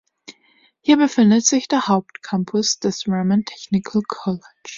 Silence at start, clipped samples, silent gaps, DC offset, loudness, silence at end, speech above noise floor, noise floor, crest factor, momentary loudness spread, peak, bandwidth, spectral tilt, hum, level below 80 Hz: 0.3 s; under 0.1%; none; under 0.1%; -19 LUFS; 0 s; 40 dB; -58 dBFS; 18 dB; 11 LU; -2 dBFS; 7.6 kHz; -4.5 dB/octave; none; -60 dBFS